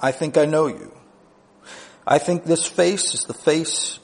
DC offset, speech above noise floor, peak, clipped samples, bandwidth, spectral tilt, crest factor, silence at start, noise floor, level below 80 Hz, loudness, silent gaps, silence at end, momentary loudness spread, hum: under 0.1%; 33 dB; -2 dBFS; under 0.1%; 10.5 kHz; -3.5 dB/octave; 20 dB; 0 s; -53 dBFS; -64 dBFS; -20 LUFS; none; 0.05 s; 15 LU; none